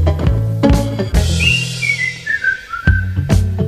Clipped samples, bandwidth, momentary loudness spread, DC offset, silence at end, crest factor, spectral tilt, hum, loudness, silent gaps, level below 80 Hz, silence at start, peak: under 0.1%; 15 kHz; 4 LU; under 0.1%; 0 s; 14 dB; -5 dB/octave; none; -15 LUFS; none; -20 dBFS; 0 s; 0 dBFS